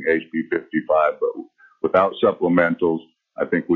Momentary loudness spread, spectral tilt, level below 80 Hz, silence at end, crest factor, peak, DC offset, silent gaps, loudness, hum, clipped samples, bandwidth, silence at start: 10 LU; -5 dB/octave; -60 dBFS; 0 s; 18 dB; -2 dBFS; under 0.1%; none; -21 LUFS; none; under 0.1%; 4.4 kHz; 0 s